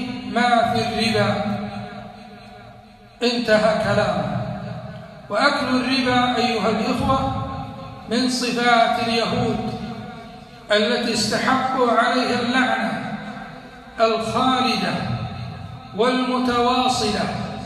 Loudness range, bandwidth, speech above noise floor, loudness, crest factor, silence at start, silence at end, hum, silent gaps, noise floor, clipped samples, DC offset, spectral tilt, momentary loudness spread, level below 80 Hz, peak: 3 LU; 14 kHz; 26 dB; -20 LUFS; 18 dB; 0 s; 0 s; none; none; -45 dBFS; under 0.1%; under 0.1%; -4.5 dB/octave; 18 LU; -46 dBFS; -2 dBFS